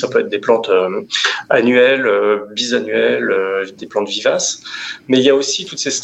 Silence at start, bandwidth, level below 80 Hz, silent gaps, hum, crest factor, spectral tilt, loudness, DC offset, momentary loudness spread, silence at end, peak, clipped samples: 0 s; 8.4 kHz; -66 dBFS; none; none; 14 dB; -2.5 dB/octave; -15 LUFS; under 0.1%; 9 LU; 0 s; 0 dBFS; under 0.1%